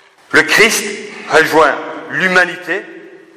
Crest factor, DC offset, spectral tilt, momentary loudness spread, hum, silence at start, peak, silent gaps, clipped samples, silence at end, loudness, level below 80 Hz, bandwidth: 14 dB; 0.2%; -2.5 dB/octave; 13 LU; none; 0.3 s; 0 dBFS; none; under 0.1%; 0.3 s; -12 LUFS; -50 dBFS; 16 kHz